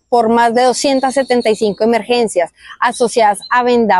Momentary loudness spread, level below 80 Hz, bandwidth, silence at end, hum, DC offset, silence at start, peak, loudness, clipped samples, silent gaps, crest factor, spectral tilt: 5 LU; -54 dBFS; 12.5 kHz; 0 s; none; under 0.1%; 0.1 s; -2 dBFS; -13 LUFS; under 0.1%; none; 10 dB; -3.5 dB/octave